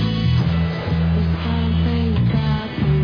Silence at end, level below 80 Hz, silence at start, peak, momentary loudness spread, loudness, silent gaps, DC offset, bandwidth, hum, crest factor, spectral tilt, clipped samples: 0 s; -28 dBFS; 0 s; -8 dBFS; 3 LU; -19 LUFS; none; under 0.1%; 5.4 kHz; none; 10 dB; -9 dB/octave; under 0.1%